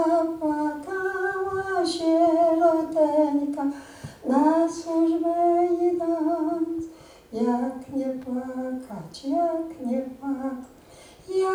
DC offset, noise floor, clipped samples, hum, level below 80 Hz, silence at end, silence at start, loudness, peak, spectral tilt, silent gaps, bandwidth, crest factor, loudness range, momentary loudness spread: under 0.1%; -49 dBFS; under 0.1%; none; -60 dBFS; 0 s; 0 s; -25 LUFS; -10 dBFS; -5.5 dB/octave; none; 15.5 kHz; 14 dB; 7 LU; 13 LU